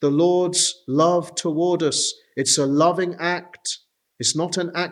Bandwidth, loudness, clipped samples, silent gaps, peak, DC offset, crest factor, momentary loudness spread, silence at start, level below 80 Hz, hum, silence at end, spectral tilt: 13.5 kHz; -21 LUFS; under 0.1%; none; -4 dBFS; under 0.1%; 16 dB; 8 LU; 0 s; -74 dBFS; none; 0 s; -3.5 dB/octave